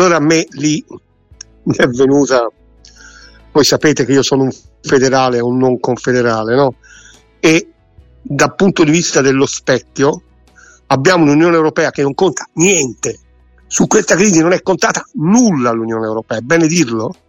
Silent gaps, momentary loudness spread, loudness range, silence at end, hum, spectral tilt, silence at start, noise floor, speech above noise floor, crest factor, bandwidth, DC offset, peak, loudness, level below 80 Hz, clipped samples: none; 9 LU; 2 LU; 0.15 s; none; -4.5 dB/octave; 0 s; -45 dBFS; 33 dB; 14 dB; 16.5 kHz; under 0.1%; 0 dBFS; -12 LUFS; -46 dBFS; under 0.1%